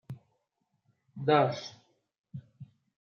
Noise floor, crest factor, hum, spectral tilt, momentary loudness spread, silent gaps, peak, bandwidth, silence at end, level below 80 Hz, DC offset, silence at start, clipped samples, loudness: -79 dBFS; 22 dB; none; -6.5 dB/octave; 23 LU; 2.19-2.24 s; -12 dBFS; 7.2 kHz; 0.45 s; -78 dBFS; under 0.1%; 0.1 s; under 0.1%; -28 LUFS